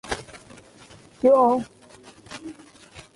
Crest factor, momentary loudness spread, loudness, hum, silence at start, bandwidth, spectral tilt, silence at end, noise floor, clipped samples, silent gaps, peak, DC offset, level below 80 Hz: 18 dB; 25 LU; -21 LUFS; none; 0.05 s; 11.5 kHz; -5 dB/octave; 0.15 s; -49 dBFS; under 0.1%; none; -6 dBFS; under 0.1%; -54 dBFS